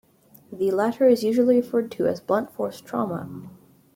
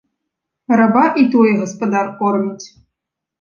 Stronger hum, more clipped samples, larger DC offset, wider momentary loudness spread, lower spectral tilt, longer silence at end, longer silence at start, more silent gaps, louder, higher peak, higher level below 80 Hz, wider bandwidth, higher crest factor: neither; neither; neither; first, 14 LU vs 8 LU; about the same, -6.5 dB/octave vs -6.5 dB/octave; second, 0.45 s vs 0.75 s; second, 0.5 s vs 0.7 s; neither; second, -23 LUFS vs -15 LUFS; second, -8 dBFS vs -2 dBFS; second, -68 dBFS vs -62 dBFS; first, 16.5 kHz vs 7.2 kHz; about the same, 16 dB vs 14 dB